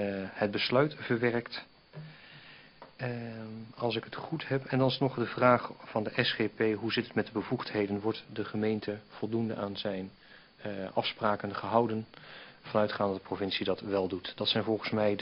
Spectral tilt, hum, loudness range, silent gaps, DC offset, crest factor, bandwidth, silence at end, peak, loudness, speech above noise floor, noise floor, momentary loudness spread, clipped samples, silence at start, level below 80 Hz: -8.5 dB/octave; none; 6 LU; none; under 0.1%; 22 dB; 5.8 kHz; 0 s; -10 dBFS; -32 LUFS; 22 dB; -54 dBFS; 17 LU; under 0.1%; 0 s; -68 dBFS